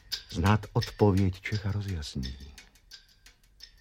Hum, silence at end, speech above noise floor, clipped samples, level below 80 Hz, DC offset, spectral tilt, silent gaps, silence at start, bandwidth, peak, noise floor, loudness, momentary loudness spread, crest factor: none; 0.85 s; 31 dB; under 0.1%; -46 dBFS; under 0.1%; -6.5 dB/octave; none; 0.1 s; 16 kHz; -8 dBFS; -59 dBFS; -29 LUFS; 25 LU; 22 dB